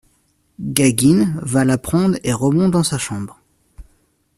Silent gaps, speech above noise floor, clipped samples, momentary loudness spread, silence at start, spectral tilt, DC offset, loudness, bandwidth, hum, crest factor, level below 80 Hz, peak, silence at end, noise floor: none; 45 dB; under 0.1%; 12 LU; 0.6 s; -5.5 dB/octave; under 0.1%; -17 LUFS; 15.5 kHz; none; 18 dB; -46 dBFS; 0 dBFS; 0.55 s; -62 dBFS